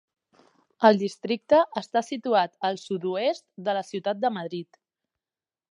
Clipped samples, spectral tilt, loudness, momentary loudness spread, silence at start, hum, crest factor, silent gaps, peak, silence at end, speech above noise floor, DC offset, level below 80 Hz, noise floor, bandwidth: under 0.1%; -5.5 dB/octave; -25 LUFS; 10 LU; 0.8 s; none; 24 dB; none; -4 dBFS; 1.1 s; over 65 dB; under 0.1%; -72 dBFS; under -90 dBFS; 11 kHz